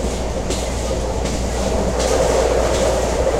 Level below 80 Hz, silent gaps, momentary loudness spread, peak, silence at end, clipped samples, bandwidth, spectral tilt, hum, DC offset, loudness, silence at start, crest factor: -24 dBFS; none; 6 LU; -4 dBFS; 0 s; under 0.1%; 15.5 kHz; -4.5 dB/octave; none; under 0.1%; -19 LUFS; 0 s; 14 dB